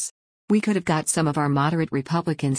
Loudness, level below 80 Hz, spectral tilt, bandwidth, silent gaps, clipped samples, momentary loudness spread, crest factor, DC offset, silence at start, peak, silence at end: -23 LUFS; -58 dBFS; -5.5 dB/octave; 10.5 kHz; 0.11-0.48 s; under 0.1%; 4 LU; 14 dB; under 0.1%; 0 s; -8 dBFS; 0 s